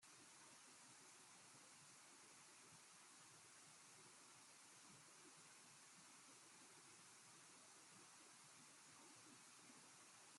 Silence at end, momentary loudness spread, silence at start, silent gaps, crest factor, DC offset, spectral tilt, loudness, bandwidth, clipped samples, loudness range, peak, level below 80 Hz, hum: 0 s; 0 LU; 0 s; none; 14 dB; under 0.1%; -1 dB/octave; -64 LUFS; 13 kHz; under 0.1%; 0 LU; -52 dBFS; under -90 dBFS; none